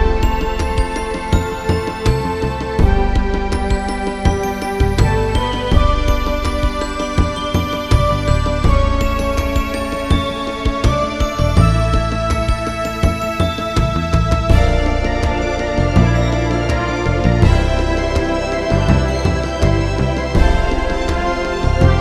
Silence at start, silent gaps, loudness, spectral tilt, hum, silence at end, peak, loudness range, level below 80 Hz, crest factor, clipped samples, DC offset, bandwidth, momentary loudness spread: 0 s; none; -17 LUFS; -6.5 dB/octave; none; 0 s; 0 dBFS; 2 LU; -20 dBFS; 14 dB; under 0.1%; under 0.1%; 14 kHz; 5 LU